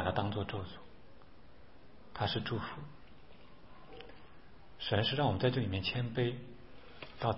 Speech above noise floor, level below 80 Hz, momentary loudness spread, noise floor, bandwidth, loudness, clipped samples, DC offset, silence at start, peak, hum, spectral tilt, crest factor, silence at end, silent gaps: 24 dB; -60 dBFS; 23 LU; -59 dBFS; 5.6 kHz; -35 LUFS; under 0.1%; 0.3%; 0 s; -16 dBFS; none; -4.5 dB/octave; 22 dB; 0 s; none